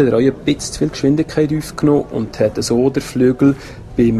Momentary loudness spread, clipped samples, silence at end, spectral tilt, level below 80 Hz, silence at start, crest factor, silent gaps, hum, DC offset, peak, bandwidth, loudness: 6 LU; under 0.1%; 0 s; -6.5 dB/octave; -38 dBFS; 0 s; 14 dB; none; none; under 0.1%; -2 dBFS; 13.5 kHz; -16 LUFS